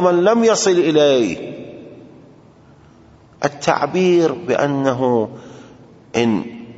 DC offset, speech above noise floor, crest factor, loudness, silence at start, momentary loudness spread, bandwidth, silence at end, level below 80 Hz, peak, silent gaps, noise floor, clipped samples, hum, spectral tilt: under 0.1%; 31 dB; 18 dB; -17 LUFS; 0 s; 16 LU; 8 kHz; 0.05 s; -58 dBFS; 0 dBFS; none; -46 dBFS; under 0.1%; none; -5 dB/octave